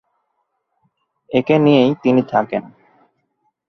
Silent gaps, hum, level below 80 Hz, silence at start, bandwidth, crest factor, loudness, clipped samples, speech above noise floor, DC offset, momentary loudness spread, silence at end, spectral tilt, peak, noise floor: none; none; -60 dBFS; 1.3 s; 6.2 kHz; 18 dB; -16 LUFS; under 0.1%; 56 dB; under 0.1%; 10 LU; 1 s; -8 dB/octave; -2 dBFS; -71 dBFS